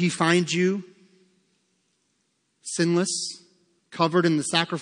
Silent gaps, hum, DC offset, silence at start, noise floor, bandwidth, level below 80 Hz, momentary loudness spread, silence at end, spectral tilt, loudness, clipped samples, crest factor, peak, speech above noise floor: none; none; under 0.1%; 0 s; -72 dBFS; 10.5 kHz; -78 dBFS; 14 LU; 0 s; -4.5 dB/octave; -23 LUFS; under 0.1%; 20 dB; -6 dBFS; 49 dB